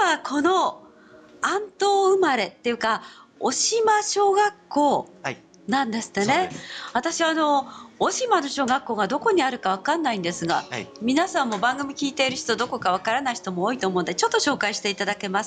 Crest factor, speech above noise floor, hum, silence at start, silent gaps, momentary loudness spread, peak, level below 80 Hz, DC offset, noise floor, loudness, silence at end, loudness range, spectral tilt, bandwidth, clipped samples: 14 dB; 26 dB; none; 0 s; none; 7 LU; -10 dBFS; -66 dBFS; under 0.1%; -49 dBFS; -23 LUFS; 0 s; 2 LU; -3 dB/octave; 9.8 kHz; under 0.1%